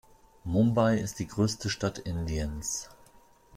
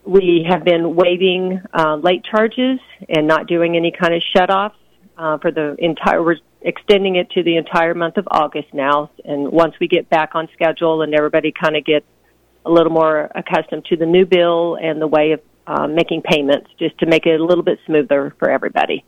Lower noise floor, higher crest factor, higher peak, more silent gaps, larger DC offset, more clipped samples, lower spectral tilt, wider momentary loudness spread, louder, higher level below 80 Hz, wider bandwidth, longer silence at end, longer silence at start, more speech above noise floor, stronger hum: about the same, -58 dBFS vs -56 dBFS; about the same, 18 dB vs 14 dB; second, -12 dBFS vs -2 dBFS; neither; neither; neither; about the same, -5.5 dB/octave vs -6.5 dB/octave; first, 11 LU vs 6 LU; second, -29 LUFS vs -16 LUFS; first, -46 dBFS vs -52 dBFS; first, 16 kHz vs 9.2 kHz; about the same, 0 s vs 0.1 s; first, 0.45 s vs 0.05 s; second, 30 dB vs 40 dB; neither